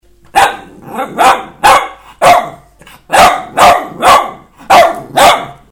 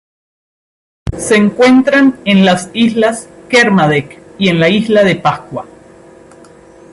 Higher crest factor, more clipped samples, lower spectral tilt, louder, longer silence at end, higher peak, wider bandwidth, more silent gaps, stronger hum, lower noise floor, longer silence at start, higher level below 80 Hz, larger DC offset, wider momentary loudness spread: about the same, 10 dB vs 12 dB; first, 0.7% vs under 0.1%; second, -2 dB/octave vs -5.5 dB/octave; about the same, -8 LUFS vs -10 LUFS; second, 0.2 s vs 1.3 s; about the same, 0 dBFS vs 0 dBFS; first, 18.5 kHz vs 11.5 kHz; neither; neither; about the same, -39 dBFS vs -39 dBFS; second, 0.35 s vs 1.05 s; about the same, -38 dBFS vs -38 dBFS; neither; about the same, 15 LU vs 16 LU